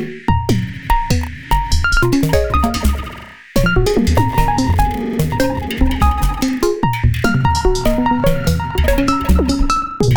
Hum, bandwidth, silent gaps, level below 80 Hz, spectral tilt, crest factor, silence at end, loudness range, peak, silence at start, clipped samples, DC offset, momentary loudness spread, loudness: none; over 20 kHz; none; -20 dBFS; -6 dB/octave; 14 dB; 0 s; 1 LU; 0 dBFS; 0 s; under 0.1%; under 0.1%; 5 LU; -16 LUFS